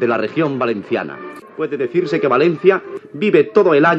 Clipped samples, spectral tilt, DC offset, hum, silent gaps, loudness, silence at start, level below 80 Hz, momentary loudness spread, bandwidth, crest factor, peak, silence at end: under 0.1%; -7.5 dB/octave; under 0.1%; none; none; -16 LUFS; 0 s; -72 dBFS; 14 LU; 7.6 kHz; 16 dB; 0 dBFS; 0 s